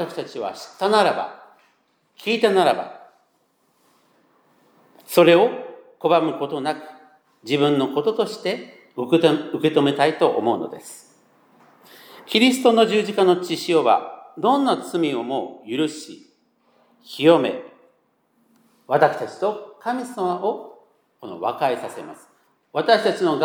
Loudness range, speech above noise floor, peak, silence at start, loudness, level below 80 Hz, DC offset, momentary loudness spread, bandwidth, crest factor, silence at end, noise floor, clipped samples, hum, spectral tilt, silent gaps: 5 LU; 45 dB; -2 dBFS; 0 s; -20 LUFS; -82 dBFS; under 0.1%; 17 LU; over 20 kHz; 20 dB; 0 s; -65 dBFS; under 0.1%; none; -5 dB/octave; none